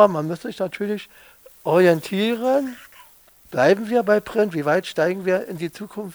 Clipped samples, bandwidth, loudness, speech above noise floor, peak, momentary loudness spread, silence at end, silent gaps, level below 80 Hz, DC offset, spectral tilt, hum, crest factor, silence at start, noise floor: under 0.1%; over 20 kHz; -21 LUFS; 31 dB; -2 dBFS; 13 LU; 0 s; none; -62 dBFS; under 0.1%; -6 dB/octave; none; 20 dB; 0 s; -51 dBFS